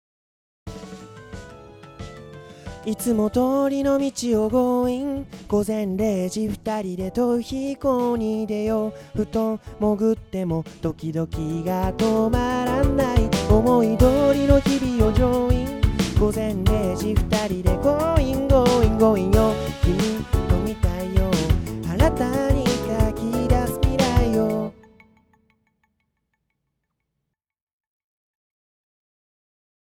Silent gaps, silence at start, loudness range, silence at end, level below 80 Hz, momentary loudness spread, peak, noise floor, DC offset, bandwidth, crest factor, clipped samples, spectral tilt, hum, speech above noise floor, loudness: none; 0.65 s; 6 LU; 5.25 s; -30 dBFS; 11 LU; -2 dBFS; -80 dBFS; under 0.1%; over 20 kHz; 20 dB; under 0.1%; -6.5 dB/octave; none; 60 dB; -22 LUFS